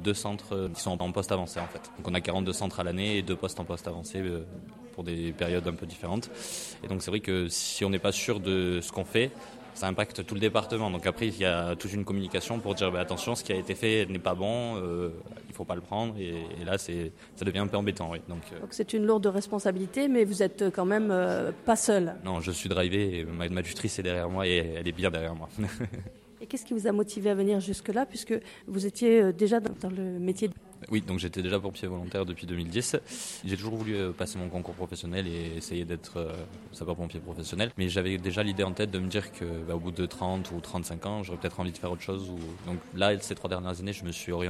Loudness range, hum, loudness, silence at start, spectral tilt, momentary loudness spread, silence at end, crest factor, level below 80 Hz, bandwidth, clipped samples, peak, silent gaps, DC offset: 7 LU; none; -31 LUFS; 0 s; -5 dB/octave; 10 LU; 0 s; 22 dB; -54 dBFS; 14.5 kHz; under 0.1%; -8 dBFS; none; under 0.1%